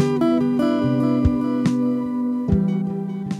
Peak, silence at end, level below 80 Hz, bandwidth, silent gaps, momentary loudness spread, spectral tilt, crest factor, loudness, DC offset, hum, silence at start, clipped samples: -6 dBFS; 0 s; -38 dBFS; 11 kHz; none; 5 LU; -8.5 dB/octave; 14 dB; -20 LUFS; under 0.1%; none; 0 s; under 0.1%